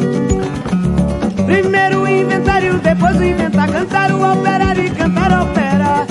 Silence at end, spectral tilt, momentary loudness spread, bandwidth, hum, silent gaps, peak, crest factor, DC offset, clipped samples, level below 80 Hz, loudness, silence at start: 0 s; -7 dB/octave; 4 LU; 11.5 kHz; none; none; 0 dBFS; 12 dB; under 0.1%; under 0.1%; -30 dBFS; -14 LUFS; 0 s